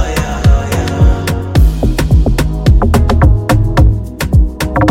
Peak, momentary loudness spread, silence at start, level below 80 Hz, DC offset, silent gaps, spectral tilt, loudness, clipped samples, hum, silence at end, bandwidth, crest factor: 0 dBFS; 5 LU; 0 s; -12 dBFS; under 0.1%; none; -6.5 dB/octave; -12 LUFS; under 0.1%; none; 0 s; 16 kHz; 10 dB